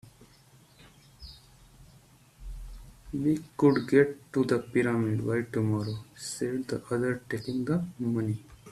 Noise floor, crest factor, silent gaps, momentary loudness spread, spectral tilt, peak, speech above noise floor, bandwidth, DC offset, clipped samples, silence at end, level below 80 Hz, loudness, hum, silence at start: -58 dBFS; 22 dB; none; 22 LU; -7 dB/octave; -8 dBFS; 30 dB; 14 kHz; under 0.1%; under 0.1%; 0 s; -52 dBFS; -29 LUFS; none; 0.05 s